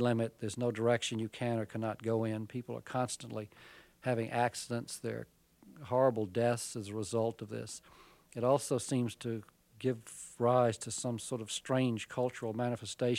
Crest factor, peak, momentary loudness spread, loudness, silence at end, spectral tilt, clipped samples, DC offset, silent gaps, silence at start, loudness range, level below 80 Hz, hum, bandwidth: 18 dB; -16 dBFS; 12 LU; -35 LUFS; 0 s; -5.5 dB/octave; under 0.1%; under 0.1%; none; 0 s; 3 LU; -74 dBFS; none; 16 kHz